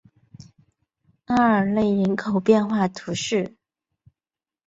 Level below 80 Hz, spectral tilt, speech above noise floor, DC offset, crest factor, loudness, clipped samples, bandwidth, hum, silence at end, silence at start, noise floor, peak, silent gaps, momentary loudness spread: -58 dBFS; -6 dB/octave; over 69 dB; under 0.1%; 18 dB; -21 LUFS; under 0.1%; 8 kHz; none; 1.2 s; 1.3 s; under -90 dBFS; -6 dBFS; none; 7 LU